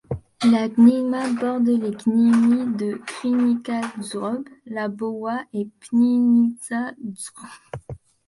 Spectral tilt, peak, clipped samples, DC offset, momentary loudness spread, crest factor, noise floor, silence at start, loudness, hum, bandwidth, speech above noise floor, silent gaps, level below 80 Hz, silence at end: -6 dB/octave; -4 dBFS; under 0.1%; under 0.1%; 17 LU; 16 dB; -40 dBFS; 0.1 s; -21 LUFS; none; 11.5 kHz; 19 dB; none; -56 dBFS; 0.3 s